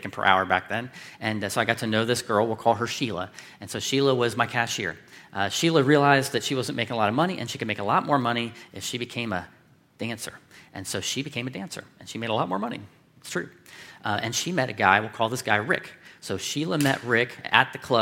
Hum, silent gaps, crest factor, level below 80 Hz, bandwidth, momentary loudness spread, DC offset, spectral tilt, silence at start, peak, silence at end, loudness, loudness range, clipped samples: none; none; 24 dB; -68 dBFS; 16.5 kHz; 16 LU; under 0.1%; -4 dB/octave; 0 s; -2 dBFS; 0 s; -25 LUFS; 8 LU; under 0.1%